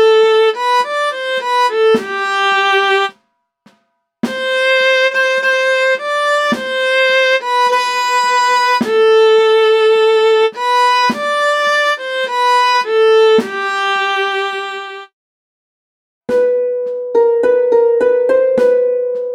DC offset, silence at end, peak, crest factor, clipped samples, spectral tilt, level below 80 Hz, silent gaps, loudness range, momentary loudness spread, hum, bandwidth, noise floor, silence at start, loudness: under 0.1%; 0 s; -2 dBFS; 12 dB; under 0.1%; -2 dB/octave; -64 dBFS; 15.13-16.21 s; 5 LU; 8 LU; none; 13 kHz; -63 dBFS; 0 s; -13 LUFS